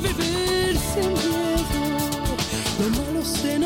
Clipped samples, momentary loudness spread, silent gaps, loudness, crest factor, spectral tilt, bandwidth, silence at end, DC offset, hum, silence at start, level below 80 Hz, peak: under 0.1%; 3 LU; none; -23 LUFS; 12 dB; -4 dB/octave; 17 kHz; 0 s; under 0.1%; none; 0 s; -34 dBFS; -10 dBFS